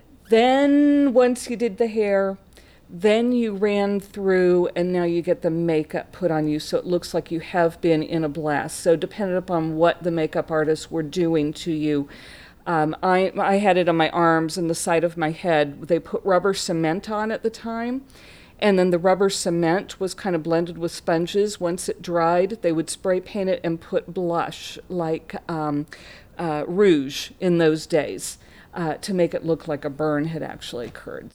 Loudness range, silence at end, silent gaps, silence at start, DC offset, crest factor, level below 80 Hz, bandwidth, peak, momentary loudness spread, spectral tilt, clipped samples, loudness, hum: 4 LU; 0.05 s; none; 0.3 s; under 0.1%; 16 dB; -54 dBFS; 16 kHz; -6 dBFS; 11 LU; -5.5 dB/octave; under 0.1%; -22 LUFS; none